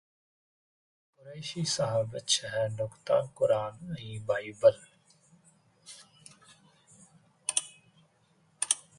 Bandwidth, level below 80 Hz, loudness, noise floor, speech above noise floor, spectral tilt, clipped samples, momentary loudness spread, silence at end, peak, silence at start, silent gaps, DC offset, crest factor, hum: 11.5 kHz; -70 dBFS; -30 LUFS; -68 dBFS; 38 dB; -3 dB/octave; under 0.1%; 24 LU; 0.2 s; -8 dBFS; 1.25 s; none; under 0.1%; 24 dB; none